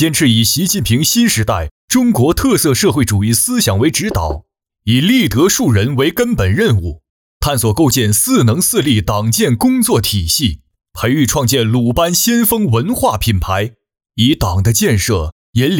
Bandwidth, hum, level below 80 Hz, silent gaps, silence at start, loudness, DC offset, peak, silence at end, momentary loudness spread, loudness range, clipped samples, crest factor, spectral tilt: 19 kHz; none; -32 dBFS; 1.71-1.88 s, 7.09-7.40 s, 15.32-15.53 s; 0 s; -13 LUFS; under 0.1%; -2 dBFS; 0 s; 7 LU; 1 LU; under 0.1%; 10 dB; -4.5 dB/octave